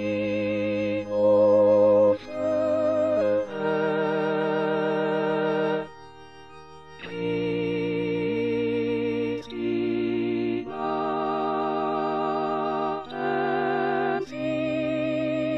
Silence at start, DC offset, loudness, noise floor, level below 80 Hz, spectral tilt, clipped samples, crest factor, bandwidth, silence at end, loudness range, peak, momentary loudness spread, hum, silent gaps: 0 s; under 0.1%; -25 LUFS; -47 dBFS; -60 dBFS; -7.5 dB/octave; under 0.1%; 14 dB; 8 kHz; 0 s; 6 LU; -10 dBFS; 9 LU; none; none